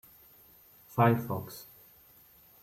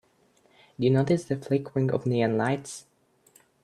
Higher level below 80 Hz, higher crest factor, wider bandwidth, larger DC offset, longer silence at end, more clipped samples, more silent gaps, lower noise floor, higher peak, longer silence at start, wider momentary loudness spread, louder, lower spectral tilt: about the same, -68 dBFS vs -66 dBFS; about the same, 22 dB vs 18 dB; first, 16 kHz vs 12 kHz; neither; first, 1 s vs 0.85 s; neither; neither; second, -59 dBFS vs -64 dBFS; about the same, -12 dBFS vs -10 dBFS; first, 0.95 s vs 0.8 s; first, 21 LU vs 8 LU; second, -29 LUFS vs -26 LUFS; about the same, -7.5 dB/octave vs -7 dB/octave